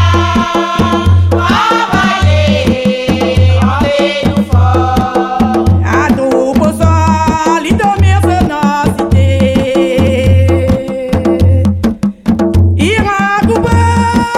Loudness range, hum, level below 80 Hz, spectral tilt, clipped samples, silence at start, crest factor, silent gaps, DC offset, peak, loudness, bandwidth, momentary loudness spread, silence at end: 1 LU; none; -24 dBFS; -6.5 dB/octave; under 0.1%; 0 s; 10 dB; none; under 0.1%; 0 dBFS; -10 LUFS; 13 kHz; 3 LU; 0 s